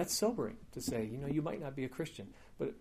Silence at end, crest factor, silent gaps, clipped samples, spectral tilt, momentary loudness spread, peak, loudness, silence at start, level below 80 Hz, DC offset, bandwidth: 0 s; 16 dB; none; under 0.1%; -4.5 dB/octave; 10 LU; -22 dBFS; -39 LUFS; 0 s; -60 dBFS; under 0.1%; 15.5 kHz